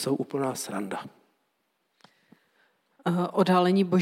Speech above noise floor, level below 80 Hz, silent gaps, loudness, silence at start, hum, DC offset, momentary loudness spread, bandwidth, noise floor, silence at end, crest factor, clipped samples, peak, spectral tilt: 50 dB; -80 dBFS; none; -27 LUFS; 0 s; none; under 0.1%; 14 LU; 15 kHz; -75 dBFS; 0 s; 18 dB; under 0.1%; -10 dBFS; -6 dB/octave